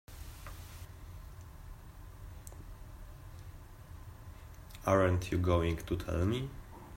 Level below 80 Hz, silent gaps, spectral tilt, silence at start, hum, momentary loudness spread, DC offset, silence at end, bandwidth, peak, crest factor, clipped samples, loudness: -50 dBFS; none; -7 dB/octave; 0.1 s; none; 22 LU; under 0.1%; 0 s; 16 kHz; -14 dBFS; 22 dB; under 0.1%; -33 LUFS